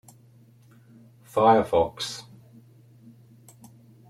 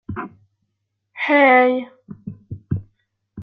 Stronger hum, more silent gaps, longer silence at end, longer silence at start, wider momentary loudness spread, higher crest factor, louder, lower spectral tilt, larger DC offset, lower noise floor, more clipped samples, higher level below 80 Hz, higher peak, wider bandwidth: neither; neither; first, 1.9 s vs 0 s; first, 1.35 s vs 0.1 s; second, 14 LU vs 25 LU; first, 24 dB vs 18 dB; second, -23 LUFS vs -17 LUFS; second, -5 dB/octave vs -8.5 dB/octave; neither; second, -55 dBFS vs -75 dBFS; neither; second, -60 dBFS vs -54 dBFS; about the same, -4 dBFS vs -2 dBFS; first, 15 kHz vs 5.8 kHz